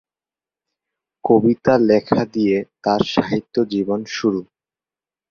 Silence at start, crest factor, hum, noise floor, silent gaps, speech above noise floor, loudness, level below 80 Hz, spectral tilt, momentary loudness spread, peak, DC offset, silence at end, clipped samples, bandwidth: 1.25 s; 18 dB; none; under -90 dBFS; none; over 73 dB; -18 LUFS; -54 dBFS; -6.5 dB/octave; 7 LU; -2 dBFS; under 0.1%; 0.9 s; under 0.1%; 7 kHz